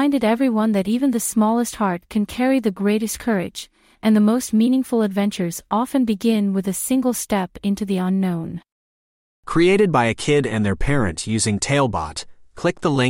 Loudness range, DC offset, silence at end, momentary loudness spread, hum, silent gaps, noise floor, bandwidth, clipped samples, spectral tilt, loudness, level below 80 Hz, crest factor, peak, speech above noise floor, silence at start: 2 LU; under 0.1%; 0 s; 7 LU; none; 8.72-9.43 s; under -90 dBFS; 16.5 kHz; under 0.1%; -5.5 dB/octave; -20 LUFS; -40 dBFS; 14 dB; -4 dBFS; over 71 dB; 0 s